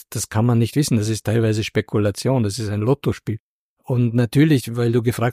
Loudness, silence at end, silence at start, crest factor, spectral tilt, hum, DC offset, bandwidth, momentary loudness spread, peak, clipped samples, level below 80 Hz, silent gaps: -20 LUFS; 0 s; 0.1 s; 14 dB; -6.5 dB/octave; none; under 0.1%; 15.5 kHz; 7 LU; -4 dBFS; under 0.1%; -50 dBFS; 3.40-3.77 s